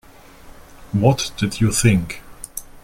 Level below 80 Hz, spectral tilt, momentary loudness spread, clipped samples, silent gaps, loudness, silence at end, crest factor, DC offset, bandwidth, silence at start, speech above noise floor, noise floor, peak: -40 dBFS; -5 dB/octave; 16 LU; under 0.1%; none; -18 LUFS; 0.05 s; 18 dB; under 0.1%; 16.5 kHz; 0.45 s; 25 dB; -43 dBFS; -2 dBFS